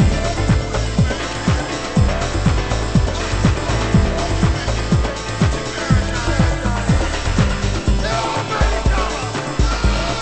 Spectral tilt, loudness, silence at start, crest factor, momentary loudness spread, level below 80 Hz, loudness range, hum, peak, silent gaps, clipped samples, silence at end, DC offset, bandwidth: -5.5 dB/octave; -19 LUFS; 0 s; 16 dB; 3 LU; -22 dBFS; 1 LU; none; -2 dBFS; none; under 0.1%; 0 s; under 0.1%; 8.8 kHz